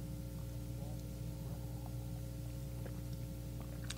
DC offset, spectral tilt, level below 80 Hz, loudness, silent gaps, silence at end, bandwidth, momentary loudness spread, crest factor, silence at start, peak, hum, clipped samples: under 0.1%; -6 dB/octave; -50 dBFS; -46 LUFS; none; 0 s; 16 kHz; 1 LU; 20 dB; 0 s; -24 dBFS; 60 Hz at -45 dBFS; under 0.1%